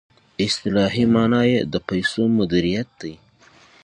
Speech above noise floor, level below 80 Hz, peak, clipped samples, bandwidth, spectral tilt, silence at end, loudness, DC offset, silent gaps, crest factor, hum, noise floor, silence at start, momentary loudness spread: 33 dB; -48 dBFS; -4 dBFS; under 0.1%; 10.5 kHz; -6 dB/octave; 0.7 s; -20 LUFS; under 0.1%; none; 16 dB; none; -52 dBFS; 0.4 s; 15 LU